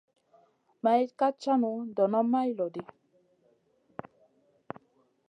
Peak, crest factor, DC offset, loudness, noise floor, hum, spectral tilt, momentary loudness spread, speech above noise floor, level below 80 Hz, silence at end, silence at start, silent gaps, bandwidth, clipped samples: -12 dBFS; 18 dB; under 0.1%; -28 LUFS; -69 dBFS; none; -7 dB/octave; 20 LU; 41 dB; -80 dBFS; 2.45 s; 0.85 s; none; 8.6 kHz; under 0.1%